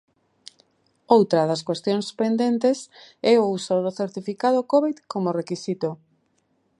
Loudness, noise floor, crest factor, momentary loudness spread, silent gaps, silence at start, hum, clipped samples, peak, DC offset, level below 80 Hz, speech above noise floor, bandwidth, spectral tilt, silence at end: -23 LUFS; -68 dBFS; 20 dB; 10 LU; none; 1.1 s; none; under 0.1%; -4 dBFS; under 0.1%; -74 dBFS; 46 dB; 11.5 kHz; -6 dB/octave; 0.85 s